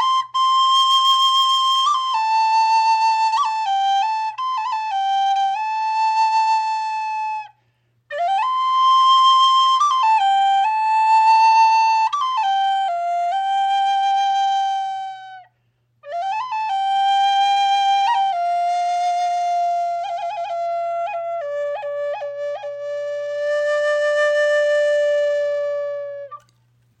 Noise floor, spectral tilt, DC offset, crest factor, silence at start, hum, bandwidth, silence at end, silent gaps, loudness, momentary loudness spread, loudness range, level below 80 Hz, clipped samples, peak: -65 dBFS; 2 dB/octave; under 0.1%; 12 dB; 0 s; none; 14.5 kHz; 0.65 s; none; -18 LUFS; 12 LU; 7 LU; -78 dBFS; under 0.1%; -8 dBFS